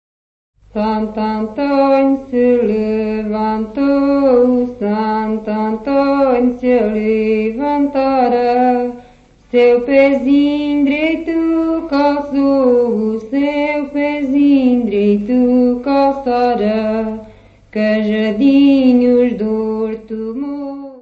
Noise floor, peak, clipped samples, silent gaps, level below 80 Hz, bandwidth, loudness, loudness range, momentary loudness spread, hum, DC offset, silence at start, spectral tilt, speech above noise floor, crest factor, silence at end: -45 dBFS; 0 dBFS; under 0.1%; none; -44 dBFS; 5.2 kHz; -14 LUFS; 2 LU; 8 LU; 50 Hz at -45 dBFS; under 0.1%; 0.75 s; -8 dB/octave; 32 dB; 14 dB; 0 s